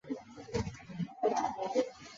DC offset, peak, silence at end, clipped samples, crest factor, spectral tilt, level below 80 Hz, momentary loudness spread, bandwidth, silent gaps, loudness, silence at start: under 0.1%; -18 dBFS; 0 s; under 0.1%; 18 dB; -5.5 dB/octave; -56 dBFS; 10 LU; 7.6 kHz; none; -36 LUFS; 0.05 s